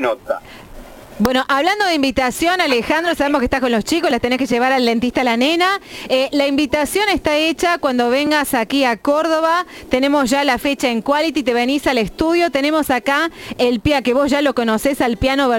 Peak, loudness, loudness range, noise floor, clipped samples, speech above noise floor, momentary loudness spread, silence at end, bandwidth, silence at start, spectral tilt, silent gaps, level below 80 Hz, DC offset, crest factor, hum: 0 dBFS; -16 LUFS; 1 LU; -36 dBFS; under 0.1%; 20 dB; 3 LU; 0 s; 17 kHz; 0 s; -4 dB/octave; none; -40 dBFS; under 0.1%; 16 dB; none